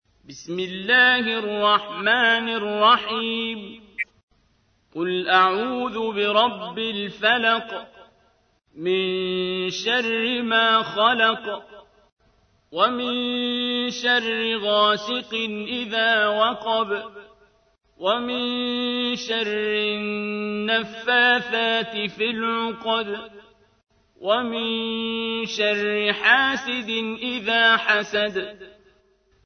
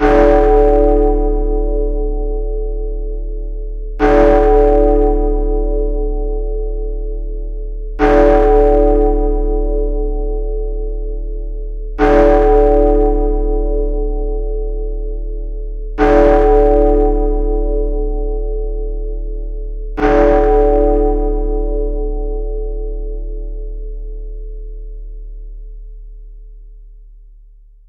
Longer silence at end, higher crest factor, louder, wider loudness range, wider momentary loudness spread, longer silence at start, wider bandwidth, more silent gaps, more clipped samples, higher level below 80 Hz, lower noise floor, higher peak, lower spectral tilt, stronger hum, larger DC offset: about the same, 0.75 s vs 0.7 s; first, 20 dB vs 14 dB; second, -21 LUFS vs -15 LUFS; second, 5 LU vs 12 LU; second, 12 LU vs 18 LU; first, 0.3 s vs 0 s; first, 6.6 kHz vs 4.4 kHz; first, 4.23-4.28 s, 12.12-12.17 s vs none; neither; second, -64 dBFS vs -18 dBFS; first, -64 dBFS vs -41 dBFS; second, -4 dBFS vs 0 dBFS; second, -3.5 dB/octave vs -9 dB/octave; neither; neither